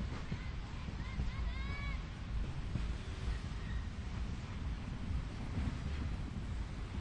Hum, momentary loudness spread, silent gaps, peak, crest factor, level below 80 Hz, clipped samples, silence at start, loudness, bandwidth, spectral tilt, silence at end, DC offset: none; 3 LU; none; -24 dBFS; 16 dB; -42 dBFS; under 0.1%; 0 s; -43 LUFS; 9.4 kHz; -6.5 dB/octave; 0 s; under 0.1%